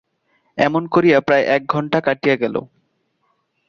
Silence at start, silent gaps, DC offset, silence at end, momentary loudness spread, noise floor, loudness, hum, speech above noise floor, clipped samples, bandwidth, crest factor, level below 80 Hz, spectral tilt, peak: 0.55 s; none; under 0.1%; 1.05 s; 8 LU; -67 dBFS; -17 LUFS; none; 50 dB; under 0.1%; 7 kHz; 18 dB; -58 dBFS; -7 dB/octave; -2 dBFS